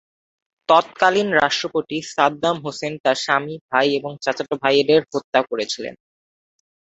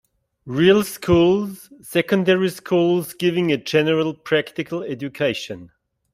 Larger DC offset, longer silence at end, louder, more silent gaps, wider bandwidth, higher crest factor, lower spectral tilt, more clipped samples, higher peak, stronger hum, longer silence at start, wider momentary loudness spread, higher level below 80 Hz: neither; first, 1 s vs 0.45 s; about the same, -20 LUFS vs -20 LUFS; first, 3.00-3.04 s, 3.61-3.69 s, 5.24-5.33 s vs none; second, 8.2 kHz vs 16 kHz; about the same, 20 dB vs 18 dB; second, -3.5 dB/octave vs -6 dB/octave; neither; about the same, -2 dBFS vs -2 dBFS; neither; first, 0.7 s vs 0.45 s; second, 10 LU vs 13 LU; second, -64 dBFS vs -52 dBFS